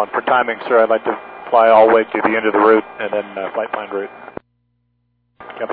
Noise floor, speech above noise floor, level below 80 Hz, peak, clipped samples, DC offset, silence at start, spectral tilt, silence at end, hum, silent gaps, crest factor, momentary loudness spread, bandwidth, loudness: -65 dBFS; 50 dB; -62 dBFS; -2 dBFS; under 0.1%; under 0.1%; 0 s; -8.5 dB/octave; 0 s; 60 Hz at -55 dBFS; none; 16 dB; 17 LU; 4.8 kHz; -15 LUFS